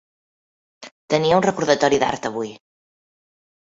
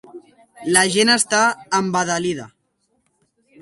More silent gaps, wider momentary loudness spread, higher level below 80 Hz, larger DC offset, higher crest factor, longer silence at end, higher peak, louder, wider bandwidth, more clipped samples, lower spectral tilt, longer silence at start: first, 0.91-1.08 s vs none; about the same, 11 LU vs 11 LU; first, -56 dBFS vs -64 dBFS; neither; about the same, 20 dB vs 20 dB; about the same, 1.05 s vs 1.15 s; about the same, -2 dBFS vs 0 dBFS; about the same, -19 LUFS vs -17 LUFS; second, 8 kHz vs 12 kHz; neither; first, -4.5 dB/octave vs -2.5 dB/octave; first, 0.8 s vs 0.15 s